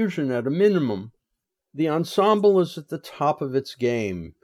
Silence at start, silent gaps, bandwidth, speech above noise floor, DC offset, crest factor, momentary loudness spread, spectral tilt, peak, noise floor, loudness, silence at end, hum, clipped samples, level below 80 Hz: 0 s; none; 14.5 kHz; 59 dB; under 0.1%; 16 dB; 13 LU; -7 dB/octave; -6 dBFS; -81 dBFS; -23 LUFS; 0.15 s; none; under 0.1%; -62 dBFS